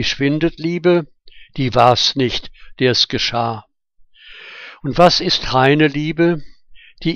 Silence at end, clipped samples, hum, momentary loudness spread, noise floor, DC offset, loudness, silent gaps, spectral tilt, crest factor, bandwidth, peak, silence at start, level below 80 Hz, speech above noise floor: 0 s; under 0.1%; none; 17 LU; -50 dBFS; under 0.1%; -16 LUFS; none; -5 dB/octave; 16 dB; 8.6 kHz; 0 dBFS; 0 s; -40 dBFS; 34 dB